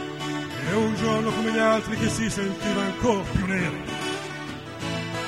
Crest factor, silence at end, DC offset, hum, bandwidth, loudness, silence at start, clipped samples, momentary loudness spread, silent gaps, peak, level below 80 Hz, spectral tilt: 18 dB; 0 s; 0.1%; none; 15.5 kHz; -26 LUFS; 0 s; under 0.1%; 9 LU; none; -8 dBFS; -46 dBFS; -5 dB/octave